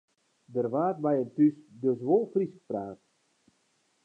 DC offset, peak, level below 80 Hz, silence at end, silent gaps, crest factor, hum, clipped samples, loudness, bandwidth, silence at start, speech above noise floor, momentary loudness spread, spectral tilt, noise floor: under 0.1%; -12 dBFS; -78 dBFS; 1.1 s; none; 18 dB; none; under 0.1%; -29 LUFS; 3.4 kHz; 0.5 s; 44 dB; 11 LU; -10.5 dB/octave; -72 dBFS